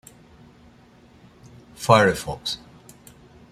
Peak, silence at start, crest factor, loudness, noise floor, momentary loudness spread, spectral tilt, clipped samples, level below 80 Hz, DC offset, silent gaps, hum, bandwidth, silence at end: -2 dBFS; 1.8 s; 24 dB; -21 LUFS; -52 dBFS; 14 LU; -4.5 dB/octave; under 0.1%; -54 dBFS; under 0.1%; none; none; 15.5 kHz; 0.95 s